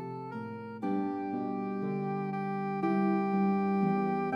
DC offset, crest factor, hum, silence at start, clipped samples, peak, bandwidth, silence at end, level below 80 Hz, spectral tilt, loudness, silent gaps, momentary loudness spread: under 0.1%; 14 dB; none; 0 s; under 0.1%; -18 dBFS; 5.4 kHz; 0 s; -80 dBFS; -10 dB/octave; -32 LUFS; none; 11 LU